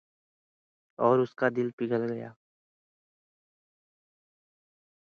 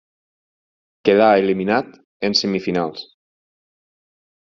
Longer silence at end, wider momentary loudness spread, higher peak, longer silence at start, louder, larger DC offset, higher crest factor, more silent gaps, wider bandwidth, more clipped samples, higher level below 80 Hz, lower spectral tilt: first, 2.75 s vs 1.4 s; about the same, 12 LU vs 13 LU; second, -10 dBFS vs -2 dBFS; about the same, 1 s vs 1.05 s; second, -28 LUFS vs -18 LUFS; neither; about the same, 24 dB vs 20 dB; second, 1.73-1.78 s vs 2.04-2.20 s; second, 6.6 kHz vs 7.4 kHz; neither; second, -78 dBFS vs -62 dBFS; first, -8.5 dB/octave vs -3 dB/octave